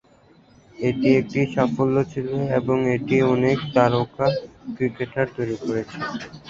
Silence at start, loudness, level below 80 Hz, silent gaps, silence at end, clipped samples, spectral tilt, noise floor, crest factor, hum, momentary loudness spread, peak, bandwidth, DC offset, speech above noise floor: 0.8 s; -22 LUFS; -54 dBFS; none; 0 s; under 0.1%; -7.5 dB/octave; -54 dBFS; 20 dB; none; 8 LU; -2 dBFS; 7.6 kHz; under 0.1%; 32 dB